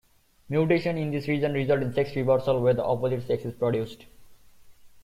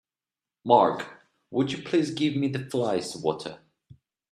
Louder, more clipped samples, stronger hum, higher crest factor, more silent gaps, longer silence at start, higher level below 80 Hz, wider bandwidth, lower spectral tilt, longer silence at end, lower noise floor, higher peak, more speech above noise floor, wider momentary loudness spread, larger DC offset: about the same, -26 LUFS vs -26 LUFS; neither; neither; second, 16 dB vs 24 dB; neither; second, 0.5 s vs 0.65 s; first, -56 dBFS vs -68 dBFS; first, 15 kHz vs 13.5 kHz; first, -8 dB/octave vs -6 dB/octave; second, 0.05 s vs 0.75 s; second, -51 dBFS vs under -90 dBFS; second, -10 dBFS vs -4 dBFS; second, 25 dB vs over 65 dB; second, 6 LU vs 16 LU; neither